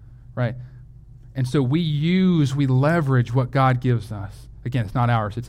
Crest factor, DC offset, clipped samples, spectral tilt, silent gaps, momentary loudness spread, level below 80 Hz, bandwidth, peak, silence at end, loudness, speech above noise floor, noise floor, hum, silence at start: 14 dB; under 0.1%; under 0.1%; -8 dB/octave; none; 16 LU; -44 dBFS; 10.5 kHz; -6 dBFS; 0 s; -21 LUFS; 23 dB; -43 dBFS; none; 0 s